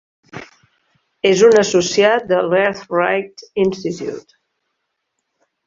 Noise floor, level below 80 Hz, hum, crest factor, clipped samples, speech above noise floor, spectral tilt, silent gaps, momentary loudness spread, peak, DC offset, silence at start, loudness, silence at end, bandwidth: -74 dBFS; -58 dBFS; none; 16 dB; under 0.1%; 59 dB; -4 dB/octave; none; 24 LU; -2 dBFS; under 0.1%; 0.35 s; -16 LUFS; 1.45 s; 7.6 kHz